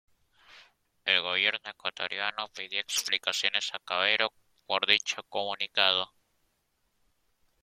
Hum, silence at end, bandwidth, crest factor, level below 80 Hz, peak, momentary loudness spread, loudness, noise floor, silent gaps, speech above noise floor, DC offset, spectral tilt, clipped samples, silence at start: none; 1.6 s; 16.5 kHz; 28 dB; -78 dBFS; -4 dBFS; 10 LU; -28 LUFS; -75 dBFS; none; 45 dB; under 0.1%; 0.5 dB/octave; under 0.1%; 0.55 s